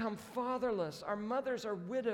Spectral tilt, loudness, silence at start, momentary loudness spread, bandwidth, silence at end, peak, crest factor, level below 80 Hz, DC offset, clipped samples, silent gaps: -5.5 dB/octave; -38 LUFS; 0 s; 4 LU; 17.5 kHz; 0 s; -24 dBFS; 14 dB; -72 dBFS; under 0.1%; under 0.1%; none